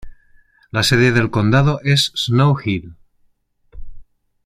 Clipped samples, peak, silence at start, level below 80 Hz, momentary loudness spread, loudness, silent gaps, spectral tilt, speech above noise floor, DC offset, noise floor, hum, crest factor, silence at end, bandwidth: under 0.1%; -2 dBFS; 0.05 s; -42 dBFS; 9 LU; -16 LUFS; none; -5.5 dB/octave; 44 dB; under 0.1%; -60 dBFS; none; 16 dB; 0.45 s; 15 kHz